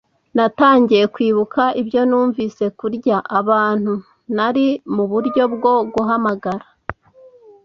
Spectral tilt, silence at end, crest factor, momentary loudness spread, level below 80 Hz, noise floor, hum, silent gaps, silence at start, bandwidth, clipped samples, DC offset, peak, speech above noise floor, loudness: -7.5 dB/octave; 0.7 s; 16 dB; 11 LU; -54 dBFS; -47 dBFS; none; none; 0.35 s; 6.8 kHz; under 0.1%; under 0.1%; -2 dBFS; 31 dB; -17 LUFS